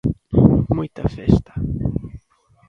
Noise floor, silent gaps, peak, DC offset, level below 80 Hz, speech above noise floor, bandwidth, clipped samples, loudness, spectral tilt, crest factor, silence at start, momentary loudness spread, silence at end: -56 dBFS; none; 0 dBFS; under 0.1%; -32 dBFS; 36 dB; 6.8 kHz; under 0.1%; -19 LUFS; -10.5 dB/octave; 18 dB; 0.05 s; 12 LU; 0.5 s